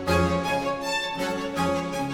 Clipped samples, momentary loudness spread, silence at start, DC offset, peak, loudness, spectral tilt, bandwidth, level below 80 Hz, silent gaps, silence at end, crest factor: under 0.1%; 5 LU; 0 s; under 0.1%; -10 dBFS; -26 LUFS; -5 dB/octave; 17.5 kHz; -44 dBFS; none; 0 s; 16 dB